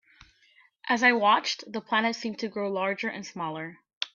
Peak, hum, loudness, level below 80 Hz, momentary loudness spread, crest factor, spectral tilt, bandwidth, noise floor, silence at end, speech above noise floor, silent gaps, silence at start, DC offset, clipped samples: -8 dBFS; none; -27 LUFS; -74 dBFS; 14 LU; 22 dB; -3.5 dB/octave; 7.4 kHz; -62 dBFS; 0.05 s; 35 dB; 3.93-4.01 s; 0.85 s; under 0.1%; under 0.1%